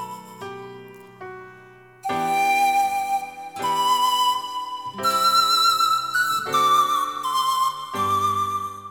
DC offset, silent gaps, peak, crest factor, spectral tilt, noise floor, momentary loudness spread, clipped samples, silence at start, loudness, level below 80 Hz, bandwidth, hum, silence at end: under 0.1%; none; -8 dBFS; 14 dB; -1.5 dB/octave; -47 dBFS; 19 LU; under 0.1%; 0 s; -21 LUFS; -66 dBFS; 19 kHz; none; 0 s